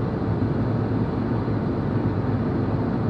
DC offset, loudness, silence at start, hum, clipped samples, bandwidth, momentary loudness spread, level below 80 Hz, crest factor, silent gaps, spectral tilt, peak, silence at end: under 0.1%; -24 LUFS; 0 s; none; under 0.1%; 5.4 kHz; 1 LU; -40 dBFS; 12 dB; none; -10.5 dB/octave; -10 dBFS; 0 s